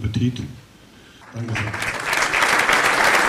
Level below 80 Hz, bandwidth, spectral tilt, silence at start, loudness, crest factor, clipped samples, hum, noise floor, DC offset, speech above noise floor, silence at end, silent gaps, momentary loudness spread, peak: -46 dBFS; 15.5 kHz; -3.5 dB/octave; 0 s; -18 LUFS; 16 dB; under 0.1%; none; -47 dBFS; under 0.1%; 23 dB; 0 s; none; 17 LU; -4 dBFS